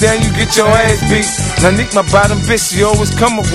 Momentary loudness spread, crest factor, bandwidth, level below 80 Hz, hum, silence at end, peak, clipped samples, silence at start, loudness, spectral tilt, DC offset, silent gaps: 3 LU; 10 dB; 15.5 kHz; -24 dBFS; none; 0 s; 0 dBFS; under 0.1%; 0 s; -11 LUFS; -4 dB/octave; under 0.1%; none